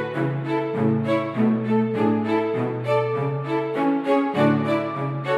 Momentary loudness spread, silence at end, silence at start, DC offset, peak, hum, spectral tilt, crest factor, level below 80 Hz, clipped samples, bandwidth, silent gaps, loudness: 5 LU; 0 s; 0 s; under 0.1%; -8 dBFS; none; -8.5 dB/octave; 14 dB; -74 dBFS; under 0.1%; 10 kHz; none; -22 LUFS